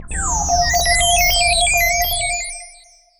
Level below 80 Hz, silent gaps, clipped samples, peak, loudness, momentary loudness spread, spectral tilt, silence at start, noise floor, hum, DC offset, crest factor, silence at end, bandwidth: -28 dBFS; none; under 0.1%; -4 dBFS; -15 LUFS; 9 LU; -0.5 dB/octave; 0 s; -47 dBFS; none; under 0.1%; 14 dB; 0.5 s; 20 kHz